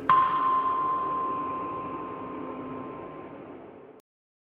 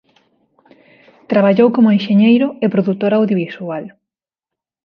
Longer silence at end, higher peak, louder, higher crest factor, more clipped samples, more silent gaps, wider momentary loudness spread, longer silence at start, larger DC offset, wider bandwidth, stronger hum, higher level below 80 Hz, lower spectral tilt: second, 0.5 s vs 0.95 s; second, -8 dBFS vs 0 dBFS; second, -29 LUFS vs -14 LUFS; first, 22 dB vs 16 dB; neither; neither; first, 20 LU vs 13 LU; second, 0 s vs 1.3 s; neither; second, 4.6 kHz vs 5.4 kHz; neither; about the same, -64 dBFS vs -64 dBFS; second, -7.5 dB/octave vs -9.5 dB/octave